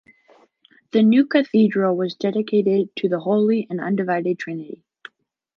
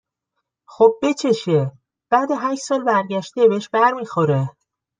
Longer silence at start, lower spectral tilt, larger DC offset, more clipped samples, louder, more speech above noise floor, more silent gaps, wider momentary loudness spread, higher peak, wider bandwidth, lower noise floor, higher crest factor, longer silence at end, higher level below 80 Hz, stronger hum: first, 0.95 s vs 0.7 s; first, -8 dB/octave vs -6 dB/octave; neither; neither; about the same, -20 LUFS vs -19 LUFS; second, 38 dB vs 60 dB; neither; first, 11 LU vs 6 LU; about the same, -4 dBFS vs -2 dBFS; second, 6.4 kHz vs 9.6 kHz; second, -57 dBFS vs -78 dBFS; about the same, 18 dB vs 18 dB; first, 0.85 s vs 0.5 s; second, -76 dBFS vs -66 dBFS; neither